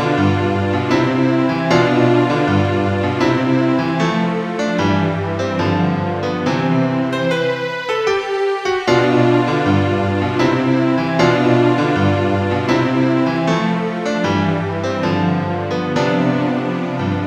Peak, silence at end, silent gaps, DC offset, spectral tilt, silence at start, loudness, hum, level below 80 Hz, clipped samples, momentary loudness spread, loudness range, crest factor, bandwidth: 0 dBFS; 0 s; none; under 0.1%; -7 dB/octave; 0 s; -16 LUFS; none; -52 dBFS; under 0.1%; 6 LU; 3 LU; 14 dB; 9.6 kHz